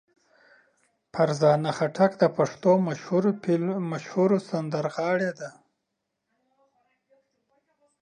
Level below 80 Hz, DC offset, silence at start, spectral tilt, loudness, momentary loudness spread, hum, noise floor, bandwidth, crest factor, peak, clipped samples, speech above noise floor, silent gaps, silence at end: -74 dBFS; under 0.1%; 1.15 s; -7 dB/octave; -25 LUFS; 8 LU; none; -81 dBFS; 10 kHz; 20 dB; -8 dBFS; under 0.1%; 57 dB; none; 2.5 s